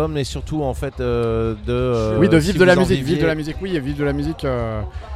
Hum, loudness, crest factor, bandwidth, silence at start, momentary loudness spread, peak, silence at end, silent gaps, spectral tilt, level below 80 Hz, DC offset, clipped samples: none; -19 LUFS; 18 dB; 15 kHz; 0 s; 11 LU; 0 dBFS; 0 s; none; -6.5 dB/octave; -32 dBFS; under 0.1%; under 0.1%